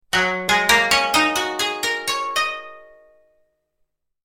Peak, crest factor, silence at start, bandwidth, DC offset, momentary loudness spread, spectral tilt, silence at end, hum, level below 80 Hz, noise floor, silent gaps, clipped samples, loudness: -2 dBFS; 20 dB; 0.15 s; 17 kHz; under 0.1%; 8 LU; -1 dB/octave; 1.4 s; none; -50 dBFS; -71 dBFS; none; under 0.1%; -18 LUFS